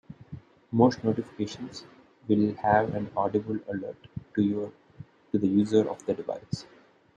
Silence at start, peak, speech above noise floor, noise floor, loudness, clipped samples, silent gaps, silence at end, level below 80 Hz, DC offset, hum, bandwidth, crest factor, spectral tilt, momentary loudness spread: 0.1 s; -8 dBFS; 23 dB; -50 dBFS; -28 LUFS; under 0.1%; none; 0.5 s; -62 dBFS; under 0.1%; none; 9 kHz; 20 dB; -7.5 dB/octave; 19 LU